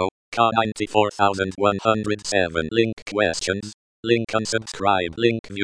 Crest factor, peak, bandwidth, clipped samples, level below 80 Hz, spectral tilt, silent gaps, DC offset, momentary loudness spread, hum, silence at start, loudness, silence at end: 20 dB; -2 dBFS; 10.5 kHz; under 0.1%; -52 dBFS; -4.5 dB/octave; 0.11-0.32 s, 2.93-3.06 s, 3.74-4.03 s, 5.39-5.44 s; under 0.1%; 6 LU; none; 0 s; -22 LUFS; 0 s